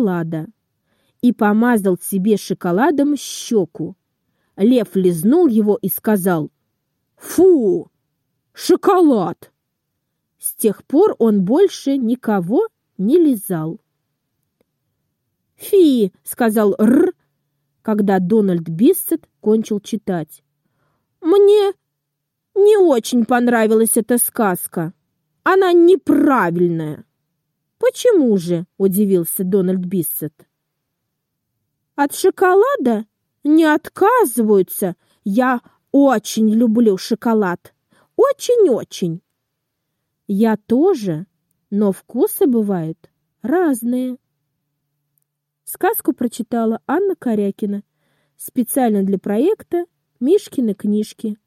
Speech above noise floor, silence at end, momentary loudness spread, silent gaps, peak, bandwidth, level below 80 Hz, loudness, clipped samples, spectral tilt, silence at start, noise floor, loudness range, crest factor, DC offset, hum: 61 dB; 0.15 s; 12 LU; none; -2 dBFS; 16.5 kHz; -66 dBFS; -16 LUFS; under 0.1%; -6 dB/octave; 0 s; -77 dBFS; 5 LU; 14 dB; under 0.1%; none